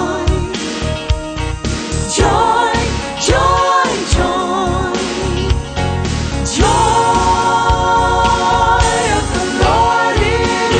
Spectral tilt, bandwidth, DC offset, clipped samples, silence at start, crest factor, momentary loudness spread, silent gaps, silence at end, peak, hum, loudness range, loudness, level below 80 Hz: -4.5 dB/octave; 9.4 kHz; under 0.1%; under 0.1%; 0 s; 14 dB; 8 LU; none; 0 s; 0 dBFS; none; 3 LU; -14 LUFS; -22 dBFS